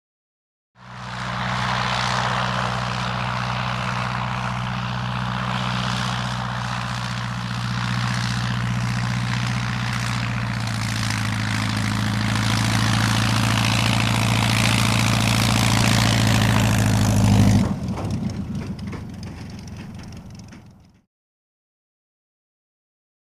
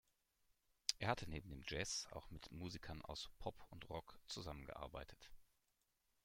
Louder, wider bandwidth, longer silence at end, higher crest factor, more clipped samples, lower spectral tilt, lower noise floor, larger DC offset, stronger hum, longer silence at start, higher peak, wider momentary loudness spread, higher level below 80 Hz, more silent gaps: first, -21 LUFS vs -49 LUFS; about the same, 15.5 kHz vs 16.5 kHz; first, 2.6 s vs 0.8 s; second, 18 dB vs 32 dB; neither; first, -4.5 dB/octave vs -3 dB/octave; second, -48 dBFS vs -85 dBFS; neither; neither; about the same, 0.8 s vs 0.9 s; first, -4 dBFS vs -18 dBFS; about the same, 13 LU vs 13 LU; first, -38 dBFS vs -64 dBFS; neither